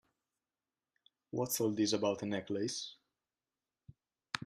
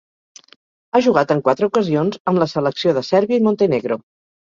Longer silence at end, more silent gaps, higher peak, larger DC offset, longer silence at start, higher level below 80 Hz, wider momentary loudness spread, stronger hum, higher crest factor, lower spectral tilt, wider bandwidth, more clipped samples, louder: second, 0 s vs 0.55 s; second, none vs 2.20-2.25 s; second, -12 dBFS vs -2 dBFS; neither; first, 1.35 s vs 0.95 s; second, -78 dBFS vs -60 dBFS; first, 11 LU vs 4 LU; neither; first, 28 dB vs 16 dB; second, -4 dB/octave vs -6.5 dB/octave; first, 13.5 kHz vs 7.6 kHz; neither; second, -36 LUFS vs -17 LUFS